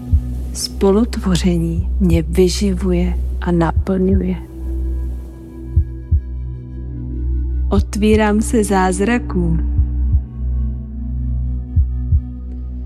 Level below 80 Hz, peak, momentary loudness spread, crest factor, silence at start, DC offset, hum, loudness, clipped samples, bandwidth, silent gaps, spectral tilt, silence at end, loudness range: -20 dBFS; 0 dBFS; 12 LU; 16 dB; 0 s; under 0.1%; none; -18 LUFS; under 0.1%; 13 kHz; none; -6.5 dB/octave; 0 s; 5 LU